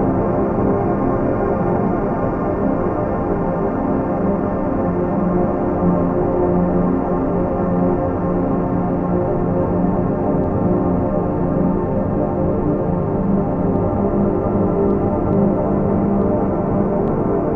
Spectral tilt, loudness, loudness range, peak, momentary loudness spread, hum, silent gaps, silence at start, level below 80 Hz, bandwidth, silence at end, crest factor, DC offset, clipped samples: -12 dB/octave; -18 LUFS; 2 LU; -4 dBFS; 2 LU; none; none; 0 s; -32 dBFS; 3 kHz; 0 s; 12 dB; under 0.1%; under 0.1%